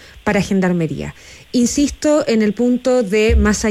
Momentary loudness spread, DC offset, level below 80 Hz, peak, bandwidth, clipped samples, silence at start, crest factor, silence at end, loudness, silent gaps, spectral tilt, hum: 7 LU; under 0.1%; -26 dBFS; -6 dBFS; 15 kHz; under 0.1%; 0.15 s; 10 dB; 0 s; -16 LUFS; none; -5.5 dB/octave; none